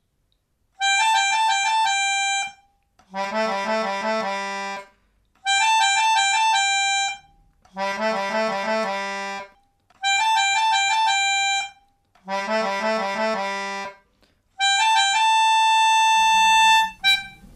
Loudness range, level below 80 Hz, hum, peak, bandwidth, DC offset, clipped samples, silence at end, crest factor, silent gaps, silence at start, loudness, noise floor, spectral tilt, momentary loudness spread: 8 LU; -62 dBFS; none; -8 dBFS; 14 kHz; under 0.1%; under 0.1%; 0.1 s; 14 dB; none; 0.8 s; -20 LUFS; -69 dBFS; 0 dB/octave; 13 LU